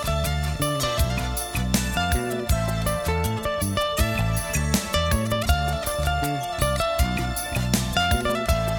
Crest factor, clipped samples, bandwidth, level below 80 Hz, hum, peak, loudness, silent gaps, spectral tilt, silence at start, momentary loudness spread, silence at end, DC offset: 20 dB; under 0.1%; over 20 kHz; -30 dBFS; none; -4 dBFS; -24 LUFS; none; -4.5 dB/octave; 0 s; 3 LU; 0 s; under 0.1%